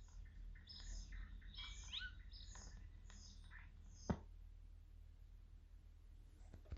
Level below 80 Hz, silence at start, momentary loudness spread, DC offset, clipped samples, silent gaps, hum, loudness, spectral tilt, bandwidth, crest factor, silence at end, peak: -58 dBFS; 0 s; 16 LU; under 0.1%; under 0.1%; none; none; -56 LUFS; -4 dB/octave; 8 kHz; 26 dB; 0 s; -30 dBFS